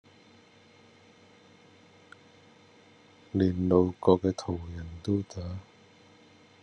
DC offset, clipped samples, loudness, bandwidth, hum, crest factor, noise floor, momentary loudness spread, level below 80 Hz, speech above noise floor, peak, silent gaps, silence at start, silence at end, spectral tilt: under 0.1%; under 0.1%; -29 LUFS; 9.8 kHz; none; 24 dB; -58 dBFS; 16 LU; -62 dBFS; 30 dB; -8 dBFS; none; 3.35 s; 1 s; -8 dB/octave